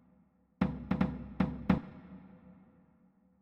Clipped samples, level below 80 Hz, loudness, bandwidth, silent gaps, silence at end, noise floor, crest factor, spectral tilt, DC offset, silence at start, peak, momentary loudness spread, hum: under 0.1%; -52 dBFS; -34 LUFS; 5.8 kHz; none; 0.85 s; -68 dBFS; 24 dB; -9.5 dB/octave; under 0.1%; 0.6 s; -12 dBFS; 20 LU; none